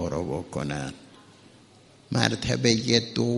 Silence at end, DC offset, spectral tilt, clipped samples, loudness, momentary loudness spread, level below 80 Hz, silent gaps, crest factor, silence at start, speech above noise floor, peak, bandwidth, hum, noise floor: 0 s; under 0.1%; -4.5 dB/octave; under 0.1%; -25 LUFS; 10 LU; -50 dBFS; none; 28 dB; 0 s; 29 dB; 0 dBFS; 11.5 kHz; none; -54 dBFS